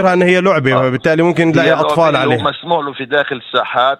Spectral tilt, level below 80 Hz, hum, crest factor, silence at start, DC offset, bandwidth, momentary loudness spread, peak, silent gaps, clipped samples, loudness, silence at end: -6.5 dB/octave; -52 dBFS; none; 12 dB; 0 s; under 0.1%; 12.5 kHz; 6 LU; 0 dBFS; none; under 0.1%; -13 LUFS; 0.05 s